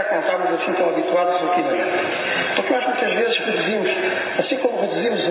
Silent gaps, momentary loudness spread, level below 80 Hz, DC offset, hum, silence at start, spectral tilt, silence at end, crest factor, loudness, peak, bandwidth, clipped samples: none; 2 LU; -70 dBFS; under 0.1%; none; 0 s; -8 dB/octave; 0 s; 16 dB; -20 LUFS; -4 dBFS; 4 kHz; under 0.1%